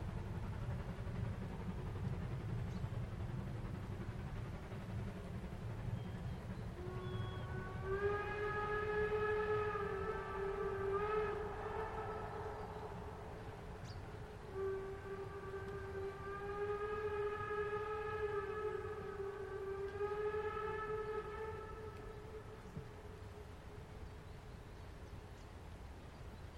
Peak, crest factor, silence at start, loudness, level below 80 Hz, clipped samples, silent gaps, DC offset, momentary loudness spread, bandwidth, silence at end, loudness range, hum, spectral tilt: -26 dBFS; 16 dB; 0 s; -44 LUFS; -54 dBFS; under 0.1%; none; under 0.1%; 14 LU; 13.5 kHz; 0 s; 10 LU; none; -7 dB/octave